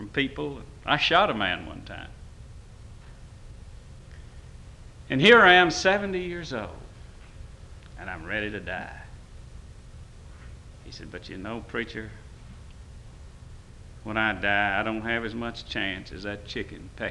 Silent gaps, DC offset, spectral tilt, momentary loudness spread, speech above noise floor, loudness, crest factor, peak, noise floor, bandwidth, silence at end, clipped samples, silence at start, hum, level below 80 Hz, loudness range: none; under 0.1%; -4.5 dB/octave; 27 LU; 20 dB; -24 LUFS; 24 dB; -4 dBFS; -45 dBFS; 11.5 kHz; 0 s; under 0.1%; 0 s; none; -46 dBFS; 17 LU